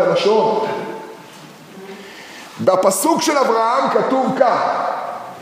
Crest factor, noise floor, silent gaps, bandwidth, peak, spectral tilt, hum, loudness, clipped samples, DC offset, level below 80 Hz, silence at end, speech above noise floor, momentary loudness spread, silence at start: 18 dB; -39 dBFS; none; 15.5 kHz; 0 dBFS; -4 dB/octave; none; -16 LUFS; under 0.1%; under 0.1%; -70 dBFS; 0 s; 23 dB; 20 LU; 0 s